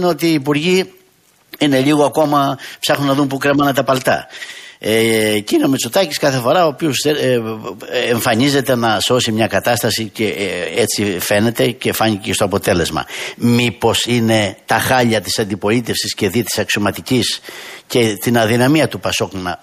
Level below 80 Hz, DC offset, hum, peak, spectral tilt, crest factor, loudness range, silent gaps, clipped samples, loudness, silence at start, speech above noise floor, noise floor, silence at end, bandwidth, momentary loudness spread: -48 dBFS; under 0.1%; none; -2 dBFS; -4.5 dB/octave; 14 dB; 1 LU; none; under 0.1%; -15 LUFS; 0 s; 38 dB; -53 dBFS; 0.05 s; 15.5 kHz; 6 LU